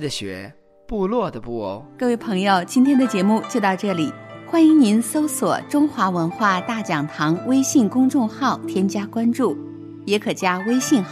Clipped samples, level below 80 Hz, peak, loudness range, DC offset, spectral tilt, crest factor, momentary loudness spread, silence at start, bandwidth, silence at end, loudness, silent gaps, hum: under 0.1%; -54 dBFS; -6 dBFS; 3 LU; under 0.1%; -5 dB/octave; 14 dB; 12 LU; 0 s; 15.5 kHz; 0 s; -20 LUFS; none; none